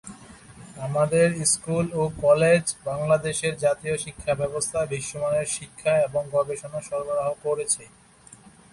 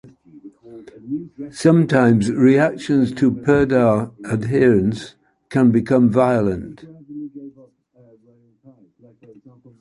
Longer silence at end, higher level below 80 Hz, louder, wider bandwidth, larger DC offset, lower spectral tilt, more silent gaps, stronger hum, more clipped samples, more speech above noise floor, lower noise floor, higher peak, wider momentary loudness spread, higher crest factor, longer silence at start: second, 0.85 s vs 2.3 s; second, -54 dBFS vs -48 dBFS; second, -24 LUFS vs -17 LUFS; about the same, 11.5 kHz vs 11.5 kHz; neither; second, -4 dB/octave vs -7.5 dB/octave; neither; neither; neither; second, 26 dB vs 39 dB; second, -50 dBFS vs -55 dBFS; second, -6 dBFS vs -2 dBFS; second, 9 LU vs 20 LU; about the same, 18 dB vs 16 dB; second, 0.05 s vs 0.45 s